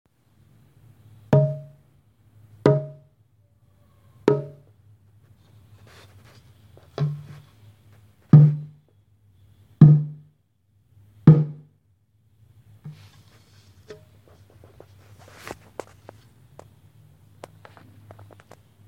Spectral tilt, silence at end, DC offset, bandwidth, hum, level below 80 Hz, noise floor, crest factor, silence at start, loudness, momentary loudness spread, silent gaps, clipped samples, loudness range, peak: -10 dB/octave; 5.95 s; under 0.1%; 5 kHz; none; -58 dBFS; -65 dBFS; 24 dB; 1.3 s; -19 LUFS; 30 LU; none; under 0.1%; 21 LU; 0 dBFS